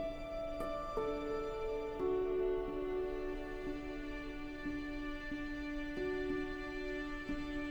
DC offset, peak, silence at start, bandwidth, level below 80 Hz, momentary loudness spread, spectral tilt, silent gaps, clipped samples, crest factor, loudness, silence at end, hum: under 0.1%; -26 dBFS; 0 s; over 20 kHz; -48 dBFS; 7 LU; -6.5 dB/octave; none; under 0.1%; 12 dB; -41 LUFS; 0 s; none